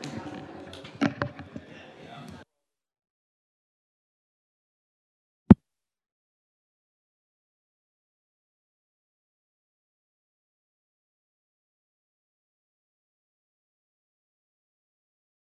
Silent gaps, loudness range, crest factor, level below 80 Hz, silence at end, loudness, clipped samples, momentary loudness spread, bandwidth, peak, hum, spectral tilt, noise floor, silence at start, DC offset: 3.10-5.46 s; 12 LU; 34 dB; -52 dBFS; 10.05 s; -24 LUFS; under 0.1%; 26 LU; 8.8 kHz; 0 dBFS; none; -8 dB/octave; -85 dBFS; 0.05 s; under 0.1%